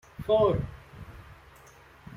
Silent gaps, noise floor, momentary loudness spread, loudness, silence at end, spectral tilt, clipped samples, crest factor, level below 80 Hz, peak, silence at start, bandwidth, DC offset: none; -54 dBFS; 24 LU; -26 LUFS; 0 s; -8 dB/octave; under 0.1%; 20 dB; -48 dBFS; -12 dBFS; 0.2 s; 15 kHz; under 0.1%